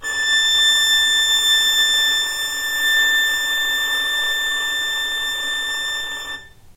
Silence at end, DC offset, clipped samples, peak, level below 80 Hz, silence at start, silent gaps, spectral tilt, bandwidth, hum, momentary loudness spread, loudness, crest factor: 0.05 s; under 0.1%; under 0.1%; -8 dBFS; -50 dBFS; 0 s; none; 2.5 dB/octave; 16 kHz; none; 9 LU; -16 LUFS; 12 dB